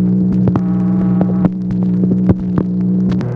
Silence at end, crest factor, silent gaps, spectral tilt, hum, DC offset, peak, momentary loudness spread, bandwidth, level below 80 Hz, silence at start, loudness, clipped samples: 0 s; 12 dB; none; -11.5 dB/octave; none; under 0.1%; 0 dBFS; 3 LU; 4 kHz; -36 dBFS; 0 s; -14 LUFS; under 0.1%